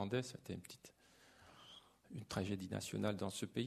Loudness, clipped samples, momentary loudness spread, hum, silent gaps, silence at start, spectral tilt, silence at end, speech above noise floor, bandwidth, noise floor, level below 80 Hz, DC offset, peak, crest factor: -44 LUFS; under 0.1%; 21 LU; none; none; 0 s; -5 dB/octave; 0 s; 24 dB; 13.5 kHz; -68 dBFS; -72 dBFS; under 0.1%; -24 dBFS; 22 dB